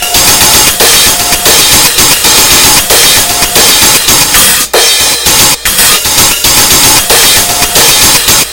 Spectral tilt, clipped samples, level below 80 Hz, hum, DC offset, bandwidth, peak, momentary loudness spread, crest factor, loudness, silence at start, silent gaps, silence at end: 0 dB/octave; 10%; -26 dBFS; none; under 0.1%; over 20 kHz; 0 dBFS; 3 LU; 4 dB; -2 LUFS; 0 s; none; 0 s